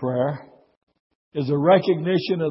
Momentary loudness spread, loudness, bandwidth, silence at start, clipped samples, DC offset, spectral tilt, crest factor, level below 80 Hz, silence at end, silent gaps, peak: 14 LU; -21 LUFS; 5.8 kHz; 0 s; under 0.1%; under 0.1%; -11.5 dB/octave; 18 dB; -66 dBFS; 0 s; 0.77-0.87 s, 1.00-1.31 s; -6 dBFS